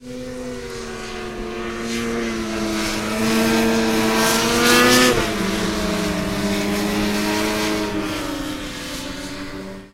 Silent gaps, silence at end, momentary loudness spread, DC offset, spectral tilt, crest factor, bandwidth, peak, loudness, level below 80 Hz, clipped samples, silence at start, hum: none; 0.05 s; 16 LU; under 0.1%; -3.5 dB/octave; 20 dB; 16 kHz; 0 dBFS; -20 LUFS; -38 dBFS; under 0.1%; 0 s; none